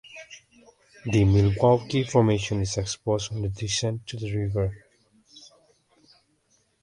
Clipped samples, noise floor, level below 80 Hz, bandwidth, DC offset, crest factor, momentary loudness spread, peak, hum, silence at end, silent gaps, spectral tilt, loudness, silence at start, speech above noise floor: under 0.1%; -67 dBFS; -44 dBFS; 11 kHz; under 0.1%; 20 dB; 12 LU; -6 dBFS; none; 1.45 s; none; -6 dB/octave; -25 LUFS; 0.1 s; 43 dB